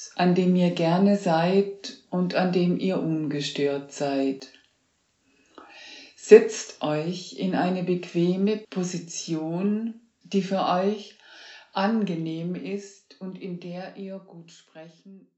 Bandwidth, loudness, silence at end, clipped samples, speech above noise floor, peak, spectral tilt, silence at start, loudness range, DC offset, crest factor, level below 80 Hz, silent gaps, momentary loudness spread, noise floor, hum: 8 kHz; -25 LUFS; 0.2 s; under 0.1%; 45 dB; 0 dBFS; -6 dB/octave; 0 s; 8 LU; under 0.1%; 26 dB; -84 dBFS; none; 17 LU; -70 dBFS; none